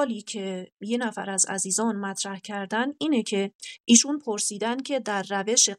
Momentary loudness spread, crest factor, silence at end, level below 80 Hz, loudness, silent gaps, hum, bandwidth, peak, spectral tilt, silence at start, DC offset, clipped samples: 14 LU; 22 dB; 0.05 s; -84 dBFS; -25 LUFS; 0.72-0.77 s, 3.55-3.59 s; none; 13.5 kHz; -4 dBFS; -2 dB/octave; 0 s; under 0.1%; under 0.1%